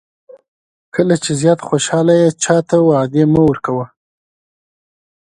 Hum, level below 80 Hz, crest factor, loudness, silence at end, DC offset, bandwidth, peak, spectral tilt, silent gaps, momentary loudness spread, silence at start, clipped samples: none; -48 dBFS; 16 dB; -14 LUFS; 1.4 s; under 0.1%; 11 kHz; 0 dBFS; -5.5 dB/octave; none; 9 LU; 0.95 s; under 0.1%